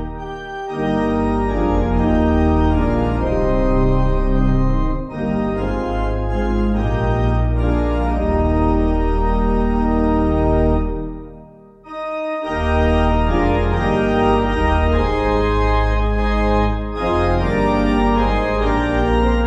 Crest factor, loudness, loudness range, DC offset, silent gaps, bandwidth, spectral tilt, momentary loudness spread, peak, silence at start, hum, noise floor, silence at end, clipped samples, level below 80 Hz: 14 dB; -18 LUFS; 3 LU; under 0.1%; none; 7.8 kHz; -8.5 dB/octave; 6 LU; -4 dBFS; 0 s; none; -42 dBFS; 0 s; under 0.1%; -22 dBFS